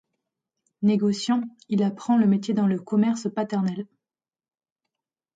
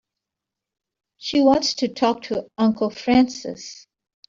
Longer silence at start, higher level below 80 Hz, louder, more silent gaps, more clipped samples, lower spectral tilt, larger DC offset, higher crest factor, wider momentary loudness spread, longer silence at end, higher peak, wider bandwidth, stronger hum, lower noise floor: second, 0.8 s vs 1.2 s; second, -72 dBFS vs -56 dBFS; second, -24 LUFS vs -20 LUFS; neither; neither; first, -7 dB/octave vs -4.5 dB/octave; neither; about the same, 14 dB vs 18 dB; second, 7 LU vs 16 LU; first, 1.5 s vs 0.5 s; second, -10 dBFS vs -4 dBFS; first, 9 kHz vs 7.6 kHz; neither; first, under -90 dBFS vs -86 dBFS